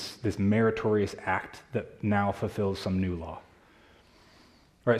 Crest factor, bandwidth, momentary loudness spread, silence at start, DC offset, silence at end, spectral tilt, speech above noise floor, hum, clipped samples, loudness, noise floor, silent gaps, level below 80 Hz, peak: 20 dB; 13.5 kHz; 11 LU; 0 s; under 0.1%; 0 s; -7 dB/octave; 31 dB; none; under 0.1%; -29 LUFS; -59 dBFS; none; -60 dBFS; -10 dBFS